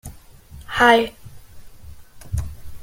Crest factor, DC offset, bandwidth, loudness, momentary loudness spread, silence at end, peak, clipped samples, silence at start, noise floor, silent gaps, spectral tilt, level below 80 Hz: 22 dB; under 0.1%; 17 kHz; -19 LUFS; 21 LU; 0 s; -2 dBFS; under 0.1%; 0.05 s; -42 dBFS; none; -4.5 dB/octave; -38 dBFS